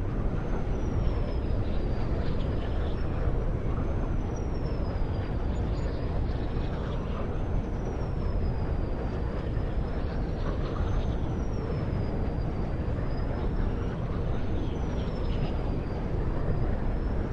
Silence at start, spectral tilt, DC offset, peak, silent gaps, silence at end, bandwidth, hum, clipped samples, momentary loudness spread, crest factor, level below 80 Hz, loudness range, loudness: 0 s; -8.5 dB/octave; under 0.1%; -14 dBFS; none; 0 s; 6.6 kHz; none; under 0.1%; 2 LU; 16 dB; -32 dBFS; 1 LU; -32 LUFS